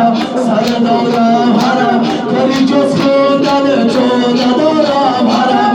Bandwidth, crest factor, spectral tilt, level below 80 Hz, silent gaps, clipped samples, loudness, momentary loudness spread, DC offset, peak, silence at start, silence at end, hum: 11 kHz; 10 dB; -5.5 dB/octave; -50 dBFS; none; under 0.1%; -11 LUFS; 2 LU; under 0.1%; 0 dBFS; 0 s; 0 s; none